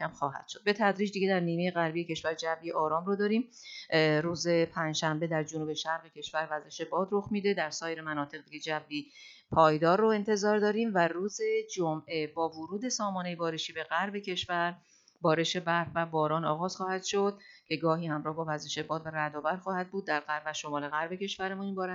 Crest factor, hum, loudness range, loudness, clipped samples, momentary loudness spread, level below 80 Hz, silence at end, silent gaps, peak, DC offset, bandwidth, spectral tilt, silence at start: 22 dB; none; 5 LU; -31 LUFS; under 0.1%; 8 LU; -70 dBFS; 0 s; none; -10 dBFS; under 0.1%; 7.8 kHz; -4.5 dB/octave; 0 s